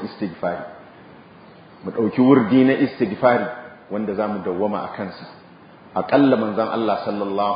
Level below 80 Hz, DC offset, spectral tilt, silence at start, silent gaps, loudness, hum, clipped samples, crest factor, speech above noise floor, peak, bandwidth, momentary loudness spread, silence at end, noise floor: -60 dBFS; under 0.1%; -11.5 dB/octave; 0 s; none; -20 LUFS; none; under 0.1%; 20 dB; 26 dB; 0 dBFS; 5.2 kHz; 16 LU; 0 s; -45 dBFS